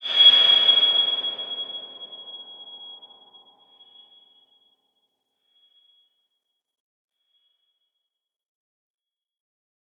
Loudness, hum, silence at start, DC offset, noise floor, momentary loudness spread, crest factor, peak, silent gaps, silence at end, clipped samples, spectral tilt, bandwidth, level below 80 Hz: -16 LUFS; none; 0 s; under 0.1%; -84 dBFS; 27 LU; 22 dB; -4 dBFS; none; 7.05 s; under 0.1%; -0.5 dB/octave; 7.8 kHz; -90 dBFS